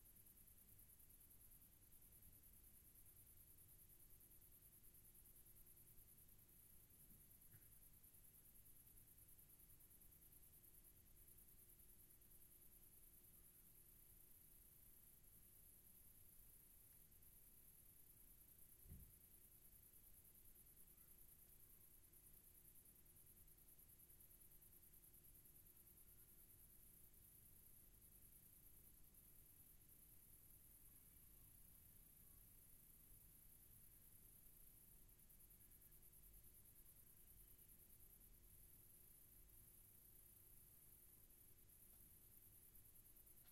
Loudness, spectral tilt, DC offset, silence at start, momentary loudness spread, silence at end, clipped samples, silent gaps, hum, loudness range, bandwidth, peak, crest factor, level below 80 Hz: -67 LUFS; -3 dB/octave; under 0.1%; 0 s; 1 LU; 0 s; under 0.1%; none; none; 1 LU; 16 kHz; -50 dBFS; 18 dB; -76 dBFS